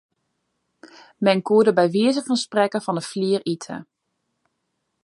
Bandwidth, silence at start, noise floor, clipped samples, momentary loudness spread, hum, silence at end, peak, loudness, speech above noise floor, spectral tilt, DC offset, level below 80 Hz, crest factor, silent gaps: 11.5 kHz; 1.2 s; -75 dBFS; under 0.1%; 12 LU; none; 1.2 s; -2 dBFS; -21 LUFS; 55 dB; -5.5 dB/octave; under 0.1%; -74 dBFS; 20 dB; none